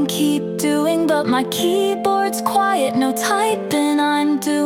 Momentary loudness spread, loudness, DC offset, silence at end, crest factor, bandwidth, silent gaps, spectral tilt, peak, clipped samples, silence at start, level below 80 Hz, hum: 2 LU; -18 LUFS; under 0.1%; 0 s; 14 dB; 17.5 kHz; none; -4 dB/octave; -4 dBFS; under 0.1%; 0 s; -62 dBFS; none